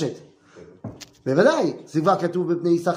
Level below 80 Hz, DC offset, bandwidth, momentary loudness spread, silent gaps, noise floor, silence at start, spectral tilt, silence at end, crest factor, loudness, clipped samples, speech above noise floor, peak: -64 dBFS; under 0.1%; 15 kHz; 21 LU; none; -47 dBFS; 0 s; -6.5 dB/octave; 0 s; 18 dB; -21 LUFS; under 0.1%; 27 dB; -4 dBFS